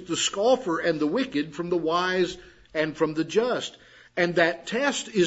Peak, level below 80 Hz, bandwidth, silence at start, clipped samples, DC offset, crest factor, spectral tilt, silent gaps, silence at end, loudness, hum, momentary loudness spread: -6 dBFS; -62 dBFS; 8 kHz; 0 s; under 0.1%; under 0.1%; 20 dB; -4 dB/octave; none; 0 s; -25 LUFS; none; 7 LU